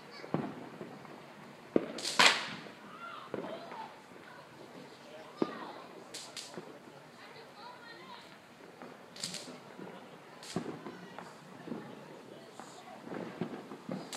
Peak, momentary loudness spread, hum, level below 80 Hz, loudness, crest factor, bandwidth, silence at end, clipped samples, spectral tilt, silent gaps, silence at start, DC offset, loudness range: -8 dBFS; 16 LU; none; -80 dBFS; -36 LUFS; 34 dB; 15.5 kHz; 0 s; under 0.1%; -2.5 dB/octave; none; 0 s; under 0.1%; 14 LU